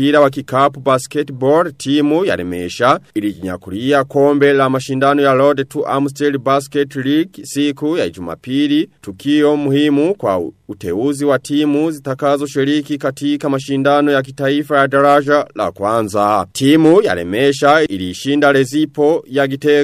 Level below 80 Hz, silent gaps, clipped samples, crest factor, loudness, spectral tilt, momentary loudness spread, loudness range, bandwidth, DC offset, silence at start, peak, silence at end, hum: -56 dBFS; none; under 0.1%; 14 dB; -15 LUFS; -5.5 dB/octave; 9 LU; 4 LU; 15 kHz; under 0.1%; 0 s; 0 dBFS; 0 s; none